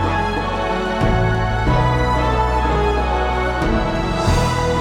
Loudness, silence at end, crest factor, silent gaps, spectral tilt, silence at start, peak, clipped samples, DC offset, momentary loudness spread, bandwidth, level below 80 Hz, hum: -18 LUFS; 0 s; 14 dB; none; -6 dB/octave; 0 s; -4 dBFS; under 0.1%; under 0.1%; 3 LU; 13.5 kHz; -24 dBFS; none